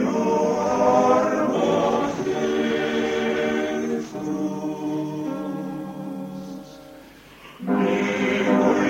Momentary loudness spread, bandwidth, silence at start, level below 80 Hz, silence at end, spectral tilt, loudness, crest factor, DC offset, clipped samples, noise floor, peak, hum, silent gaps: 14 LU; 16 kHz; 0 s; -56 dBFS; 0 s; -5.5 dB/octave; -23 LUFS; 16 dB; under 0.1%; under 0.1%; -45 dBFS; -6 dBFS; none; none